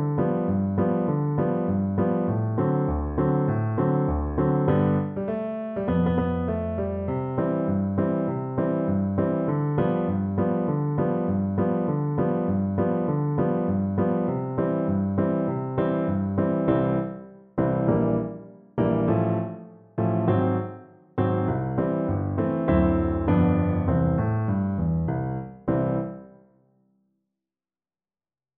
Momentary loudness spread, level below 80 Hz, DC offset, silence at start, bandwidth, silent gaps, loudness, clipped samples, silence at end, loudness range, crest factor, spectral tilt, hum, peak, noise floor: 6 LU; -42 dBFS; under 0.1%; 0 s; 3.7 kHz; none; -25 LUFS; under 0.1%; 2.3 s; 3 LU; 16 dB; -13 dB/octave; none; -10 dBFS; under -90 dBFS